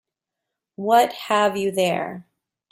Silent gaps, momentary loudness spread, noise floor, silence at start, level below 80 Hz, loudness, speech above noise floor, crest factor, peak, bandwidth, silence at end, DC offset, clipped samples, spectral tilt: none; 13 LU; -84 dBFS; 0.8 s; -68 dBFS; -21 LUFS; 64 dB; 18 dB; -4 dBFS; 16 kHz; 0.5 s; under 0.1%; under 0.1%; -4 dB/octave